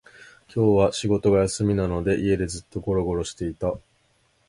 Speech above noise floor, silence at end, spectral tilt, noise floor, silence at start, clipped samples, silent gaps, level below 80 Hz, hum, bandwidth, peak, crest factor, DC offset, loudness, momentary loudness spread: 42 dB; 0.7 s; -6 dB/octave; -65 dBFS; 0.55 s; under 0.1%; none; -42 dBFS; none; 11.5 kHz; -6 dBFS; 18 dB; under 0.1%; -24 LUFS; 10 LU